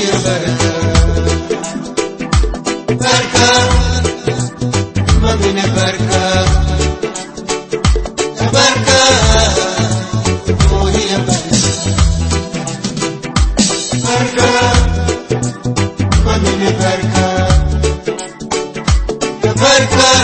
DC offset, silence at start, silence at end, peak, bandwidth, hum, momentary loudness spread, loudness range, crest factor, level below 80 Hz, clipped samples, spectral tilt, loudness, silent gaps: under 0.1%; 0 s; 0 s; 0 dBFS; 8.8 kHz; none; 10 LU; 3 LU; 12 dB; -20 dBFS; under 0.1%; -4 dB/octave; -13 LUFS; none